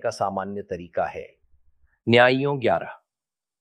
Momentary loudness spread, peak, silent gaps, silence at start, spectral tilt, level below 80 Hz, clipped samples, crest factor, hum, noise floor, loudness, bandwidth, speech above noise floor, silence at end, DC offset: 16 LU; -2 dBFS; none; 0.05 s; -6 dB/octave; -62 dBFS; under 0.1%; 22 dB; none; under -90 dBFS; -23 LUFS; 11 kHz; over 67 dB; 0.65 s; under 0.1%